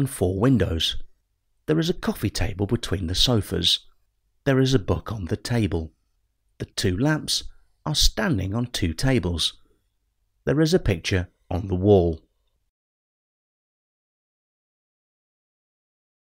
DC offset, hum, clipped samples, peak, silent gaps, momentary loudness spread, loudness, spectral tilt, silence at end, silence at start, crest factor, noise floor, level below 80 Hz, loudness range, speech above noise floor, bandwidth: under 0.1%; none; under 0.1%; -4 dBFS; none; 10 LU; -23 LUFS; -5 dB/octave; 4.1 s; 0 s; 22 dB; -71 dBFS; -38 dBFS; 3 LU; 49 dB; 16 kHz